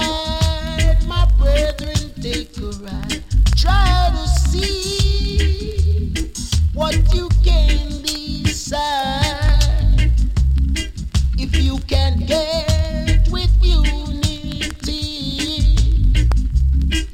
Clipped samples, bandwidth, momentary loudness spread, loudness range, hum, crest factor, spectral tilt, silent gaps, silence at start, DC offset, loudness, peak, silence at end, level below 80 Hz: under 0.1%; 13.5 kHz; 8 LU; 1 LU; none; 12 dB; -5 dB/octave; none; 0 s; under 0.1%; -18 LUFS; -2 dBFS; 0 s; -16 dBFS